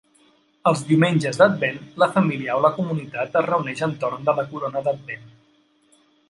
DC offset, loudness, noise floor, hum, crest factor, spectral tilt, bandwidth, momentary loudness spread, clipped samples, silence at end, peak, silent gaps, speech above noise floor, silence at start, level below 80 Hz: under 0.1%; -21 LUFS; -60 dBFS; none; 20 dB; -6.5 dB/octave; 11.5 kHz; 9 LU; under 0.1%; 1 s; -2 dBFS; none; 39 dB; 0.65 s; -66 dBFS